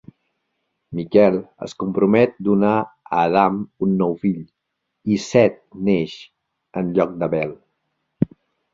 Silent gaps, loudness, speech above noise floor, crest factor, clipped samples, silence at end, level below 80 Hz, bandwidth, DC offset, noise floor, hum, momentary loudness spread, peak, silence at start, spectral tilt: none; -20 LUFS; 55 dB; 20 dB; under 0.1%; 0.5 s; -56 dBFS; 7.6 kHz; under 0.1%; -74 dBFS; none; 14 LU; -2 dBFS; 0.9 s; -7.5 dB/octave